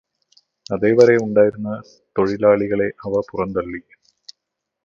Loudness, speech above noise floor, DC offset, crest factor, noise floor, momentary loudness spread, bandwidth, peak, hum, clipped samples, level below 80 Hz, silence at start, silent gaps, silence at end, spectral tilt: -18 LUFS; 63 dB; under 0.1%; 20 dB; -80 dBFS; 15 LU; 7.2 kHz; 0 dBFS; none; under 0.1%; -54 dBFS; 0.7 s; none; 1.05 s; -7 dB/octave